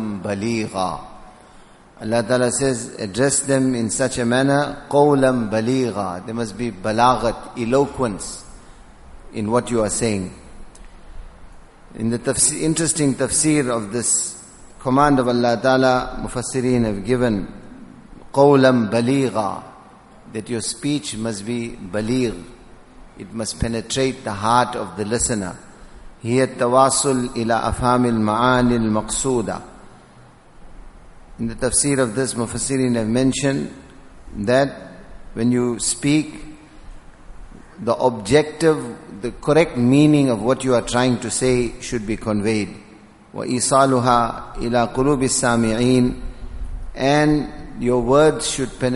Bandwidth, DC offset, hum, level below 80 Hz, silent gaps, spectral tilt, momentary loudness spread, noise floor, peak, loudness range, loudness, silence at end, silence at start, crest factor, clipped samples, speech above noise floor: 11.5 kHz; under 0.1%; none; -40 dBFS; none; -4.5 dB/octave; 14 LU; -46 dBFS; 0 dBFS; 6 LU; -19 LUFS; 0 s; 0 s; 20 dB; under 0.1%; 28 dB